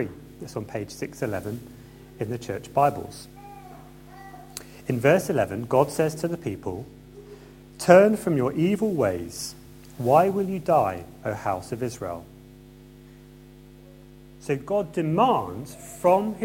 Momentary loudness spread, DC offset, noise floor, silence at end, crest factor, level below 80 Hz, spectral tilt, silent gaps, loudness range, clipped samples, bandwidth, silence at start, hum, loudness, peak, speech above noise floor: 23 LU; under 0.1%; -48 dBFS; 0 s; 24 dB; -54 dBFS; -6 dB/octave; none; 10 LU; under 0.1%; 16.5 kHz; 0 s; none; -24 LUFS; 0 dBFS; 24 dB